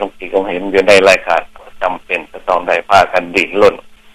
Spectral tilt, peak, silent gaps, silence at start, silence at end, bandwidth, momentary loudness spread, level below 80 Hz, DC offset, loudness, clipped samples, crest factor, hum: -3.5 dB/octave; 0 dBFS; none; 0 s; 0.25 s; 15.5 kHz; 12 LU; -42 dBFS; under 0.1%; -12 LUFS; 0.2%; 14 dB; none